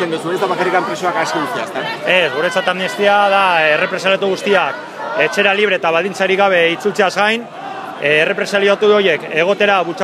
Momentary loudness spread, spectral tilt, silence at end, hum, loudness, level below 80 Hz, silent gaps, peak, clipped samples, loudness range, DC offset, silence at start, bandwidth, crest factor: 8 LU; -4 dB/octave; 0 s; none; -14 LUFS; -72 dBFS; none; 0 dBFS; under 0.1%; 1 LU; under 0.1%; 0 s; 15 kHz; 14 dB